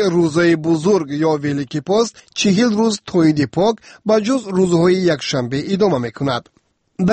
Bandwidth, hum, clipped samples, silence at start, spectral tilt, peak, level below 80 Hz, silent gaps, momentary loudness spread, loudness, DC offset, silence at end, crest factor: 8.8 kHz; none; under 0.1%; 0 s; -6 dB/octave; -4 dBFS; -52 dBFS; none; 7 LU; -17 LUFS; under 0.1%; 0 s; 12 dB